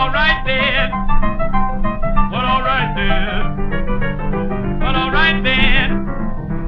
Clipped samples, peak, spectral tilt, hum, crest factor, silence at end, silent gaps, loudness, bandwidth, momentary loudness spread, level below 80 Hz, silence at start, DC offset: under 0.1%; 0 dBFS; -7.5 dB/octave; none; 14 dB; 0 s; none; -17 LUFS; 5.2 kHz; 8 LU; -18 dBFS; 0 s; under 0.1%